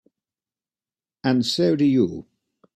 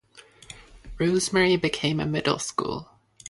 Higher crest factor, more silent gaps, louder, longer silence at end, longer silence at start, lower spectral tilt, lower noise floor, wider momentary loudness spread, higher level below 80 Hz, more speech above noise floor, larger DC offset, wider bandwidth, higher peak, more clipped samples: about the same, 18 dB vs 18 dB; neither; first, -21 LUFS vs -24 LUFS; first, 0.55 s vs 0 s; first, 1.25 s vs 0.15 s; first, -6 dB/octave vs -4.5 dB/octave; first, under -90 dBFS vs -52 dBFS; second, 9 LU vs 23 LU; second, -62 dBFS vs -50 dBFS; first, over 70 dB vs 28 dB; neither; first, 13.5 kHz vs 11.5 kHz; about the same, -6 dBFS vs -8 dBFS; neither